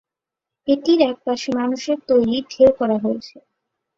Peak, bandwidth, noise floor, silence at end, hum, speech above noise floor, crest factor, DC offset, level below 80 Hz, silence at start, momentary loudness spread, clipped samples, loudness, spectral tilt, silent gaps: -2 dBFS; 7.6 kHz; -86 dBFS; 0.7 s; none; 68 dB; 18 dB; under 0.1%; -56 dBFS; 0.65 s; 9 LU; under 0.1%; -19 LUFS; -5.5 dB/octave; none